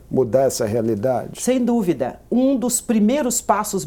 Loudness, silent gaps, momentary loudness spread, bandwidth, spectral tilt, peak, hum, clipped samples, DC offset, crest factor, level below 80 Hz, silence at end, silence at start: -19 LUFS; none; 5 LU; 18.5 kHz; -5 dB/octave; -2 dBFS; none; under 0.1%; under 0.1%; 16 dB; -50 dBFS; 0 s; 0.1 s